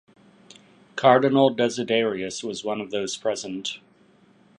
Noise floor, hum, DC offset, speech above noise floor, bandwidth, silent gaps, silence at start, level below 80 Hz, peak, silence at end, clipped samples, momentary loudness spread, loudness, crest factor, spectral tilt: -57 dBFS; none; under 0.1%; 35 dB; 11 kHz; none; 0.95 s; -68 dBFS; -2 dBFS; 0.85 s; under 0.1%; 14 LU; -23 LUFS; 22 dB; -4.5 dB/octave